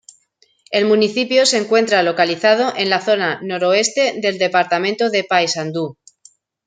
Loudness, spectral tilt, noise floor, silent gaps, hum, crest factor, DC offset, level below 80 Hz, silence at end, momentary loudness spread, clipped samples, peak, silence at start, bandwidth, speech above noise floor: -16 LUFS; -3 dB/octave; -59 dBFS; none; none; 16 dB; under 0.1%; -68 dBFS; 0.75 s; 6 LU; under 0.1%; -2 dBFS; 0.7 s; 9.6 kHz; 43 dB